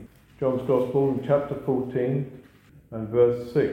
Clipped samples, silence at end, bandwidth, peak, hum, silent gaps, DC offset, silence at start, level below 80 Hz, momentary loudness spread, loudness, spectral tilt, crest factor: under 0.1%; 0 s; 15.5 kHz; -8 dBFS; none; none; under 0.1%; 0 s; -56 dBFS; 9 LU; -25 LUFS; -9.5 dB/octave; 16 dB